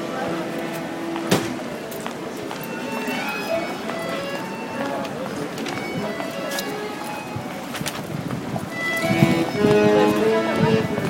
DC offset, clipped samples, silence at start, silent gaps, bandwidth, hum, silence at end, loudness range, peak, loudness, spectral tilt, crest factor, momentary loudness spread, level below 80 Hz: under 0.1%; under 0.1%; 0 s; none; 16.5 kHz; none; 0 s; 7 LU; 0 dBFS; -24 LUFS; -5.5 dB/octave; 22 dB; 12 LU; -54 dBFS